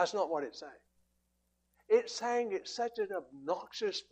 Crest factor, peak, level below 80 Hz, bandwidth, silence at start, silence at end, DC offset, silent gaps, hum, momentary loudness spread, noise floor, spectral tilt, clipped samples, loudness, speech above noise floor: 18 dB; -18 dBFS; -80 dBFS; 8.8 kHz; 0 s; 0.1 s; under 0.1%; none; 60 Hz at -60 dBFS; 11 LU; -78 dBFS; -2.5 dB/octave; under 0.1%; -35 LUFS; 43 dB